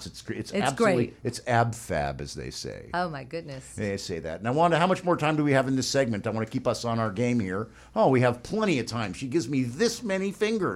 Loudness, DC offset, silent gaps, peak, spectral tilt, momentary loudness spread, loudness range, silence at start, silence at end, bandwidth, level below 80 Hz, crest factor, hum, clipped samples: -27 LUFS; under 0.1%; none; -10 dBFS; -5.5 dB/octave; 12 LU; 4 LU; 0 s; 0 s; 15.5 kHz; -52 dBFS; 16 dB; none; under 0.1%